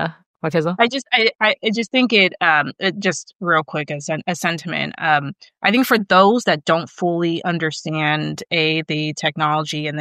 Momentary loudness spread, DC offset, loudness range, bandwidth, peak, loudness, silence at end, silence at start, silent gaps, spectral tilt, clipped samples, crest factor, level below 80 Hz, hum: 9 LU; under 0.1%; 3 LU; 14 kHz; -2 dBFS; -18 LUFS; 0 s; 0 s; 0.26-0.34 s; -4.5 dB/octave; under 0.1%; 18 dB; -68 dBFS; none